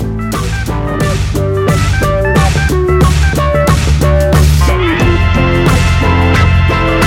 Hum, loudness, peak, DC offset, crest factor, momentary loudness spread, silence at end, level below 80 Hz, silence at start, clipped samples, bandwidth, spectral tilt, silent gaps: none; -11 LUFS; 0 dBFS; under 0.1%; 8 dB; 6 LU; 0 s; -14 dBFS; 0 s; under 0.1%; 16.5 kHz; -6 dB/octave; none